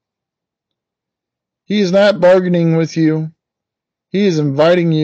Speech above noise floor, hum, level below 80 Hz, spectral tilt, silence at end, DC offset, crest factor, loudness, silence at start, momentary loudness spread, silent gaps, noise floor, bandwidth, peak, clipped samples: 71 dB; none; -62 dBFS; -7 dB/octave; 0 s; under 0.1%; 12 dB; -13 LUFS; 1.7 s; 10 LU; none; -83 dBFS; 8 kHz; -2 dBFS; under 0.1%